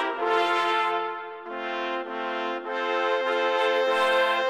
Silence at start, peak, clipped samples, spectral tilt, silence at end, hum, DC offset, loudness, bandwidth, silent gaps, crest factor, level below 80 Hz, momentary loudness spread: 0 s; -10 dBFS; under 0.1%; -2 dB/octave; 0 s; none; under 0.1%; -25 LUFS; 15.5 kHz; none; 16 dB; -84 dBFS; 10 LU